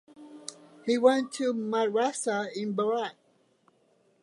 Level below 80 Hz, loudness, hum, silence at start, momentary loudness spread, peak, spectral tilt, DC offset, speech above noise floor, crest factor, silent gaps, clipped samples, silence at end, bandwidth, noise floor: -84 dBFS; -28 LUFS; none; 0.2 s; 19 LU; -8 dBFS; -4 dB/octave; under 0.1%; 40 dB; 22 dB; none; under 0.1%; 1.1 s; 11.5 kHz; -67 dBFS